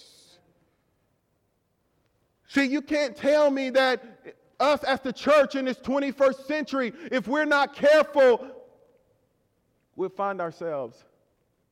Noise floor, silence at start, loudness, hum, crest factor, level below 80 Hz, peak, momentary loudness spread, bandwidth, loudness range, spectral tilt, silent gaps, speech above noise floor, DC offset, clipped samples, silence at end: -72 dBFS; 2.5 s; -24 LUFS; none; 16 dB; -66 dBFS; -10 dBFS; 12 LU; 14 kHz; 6 LU; -4.5 dB/octave; none; 48 dB; under 0.1%; under 0.1%; 0.8 s